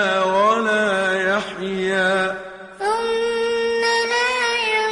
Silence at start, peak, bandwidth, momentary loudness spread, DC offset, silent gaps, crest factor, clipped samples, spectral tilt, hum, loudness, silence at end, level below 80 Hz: 0 s; -6 dBFS; 11 kHz; 7 LU; under 0.1%; none; 14 dB; under 0.1%; -3.5 dB/octave; none; -19 LUFS; 0 s; -56 dBFS